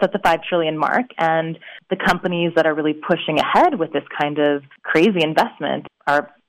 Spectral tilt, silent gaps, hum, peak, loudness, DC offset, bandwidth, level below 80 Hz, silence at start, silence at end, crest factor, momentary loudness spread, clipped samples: -6 dB/octave; none; none; -6 dBFS; -19 LUFS; under 0.1%; 16 kHz; -52 dBFS; 0 s; 0.2 s; 14 dB; 9 LU; under 0.1%